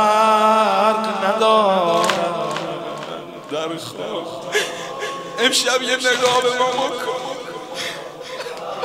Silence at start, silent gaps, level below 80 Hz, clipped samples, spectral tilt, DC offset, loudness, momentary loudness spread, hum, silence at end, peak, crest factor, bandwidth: 0 s; none; -66 dBFS; under 0.1%; -2.5 dB/octave; under 0.1%; -19 LUFS; 15 LU; none; 0 s; 0 dBFS; 20 dB; 16 kHz